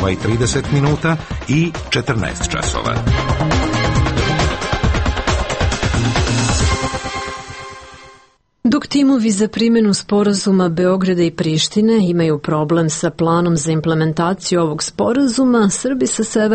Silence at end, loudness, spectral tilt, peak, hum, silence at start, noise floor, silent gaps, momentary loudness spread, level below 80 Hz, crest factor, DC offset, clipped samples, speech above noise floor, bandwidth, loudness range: 0 s; -16 LUFS; -5 dB/octave; -4 dBFS; none; 0 s; -51 dBFS; none; 6 LU; -28 dBFS; 12 dB; under 0.1%; under 0.1%; 36 dB; 8.8 kHz; 4 LU